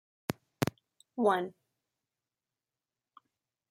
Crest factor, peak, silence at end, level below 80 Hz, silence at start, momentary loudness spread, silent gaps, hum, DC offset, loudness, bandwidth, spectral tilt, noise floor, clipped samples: 28 dB; -10 dBFS; 2.2 s; -72 dBFS; 0.3 s; 13 LU; none; none; under 0.1%; -34 LUFS; 16 kHz; -5.5 dB/octave; under -90 dBFS; under 0.1%